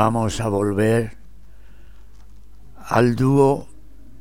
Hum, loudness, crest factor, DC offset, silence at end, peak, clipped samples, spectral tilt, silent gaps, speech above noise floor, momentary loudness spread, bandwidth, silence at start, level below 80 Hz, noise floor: none; -19 LUFS; 18 dB; 1%; 0.55 s; -4 dBFS; under 0.1%; -7 dB/octave; none; 28 dB; 6 LU; 16.5 kHz; 0 s; -44 dBFS; -46 dBFS